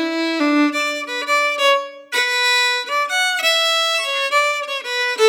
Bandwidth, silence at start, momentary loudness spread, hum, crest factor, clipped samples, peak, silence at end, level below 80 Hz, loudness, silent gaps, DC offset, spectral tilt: over 20 kHz; 0 s; 6 LU; none; 14 dB; under 0.1%; -4 dBFS; 0 s; -88 dBFS; -17 LUFS; none; under 0.1%; 1 dB/octave